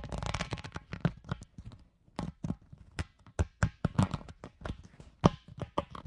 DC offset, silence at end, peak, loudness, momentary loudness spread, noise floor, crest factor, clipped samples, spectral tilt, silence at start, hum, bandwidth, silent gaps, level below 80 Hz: under 0.1%; 0.05 s; -4 dBFS; -36 LUFS; 18 LU; -56 dBFS; 32 dB; under 0.1%; -6.5 dB/octave; 0 s; none; 11.5 kHz; none; -46 dBFS